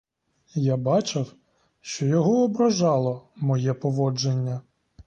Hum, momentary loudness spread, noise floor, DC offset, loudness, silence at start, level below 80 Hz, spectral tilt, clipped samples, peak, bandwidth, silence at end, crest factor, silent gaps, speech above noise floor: none; 13 LU; -63 dBFS; under 0.1%; -24 LUFS; 0.55 s; -62 dBFS; -6.5 dB/octave; under 0.1%; -10 dBFS; 8.4 kHz; 0.45 s; 14 dB; none; 40 dB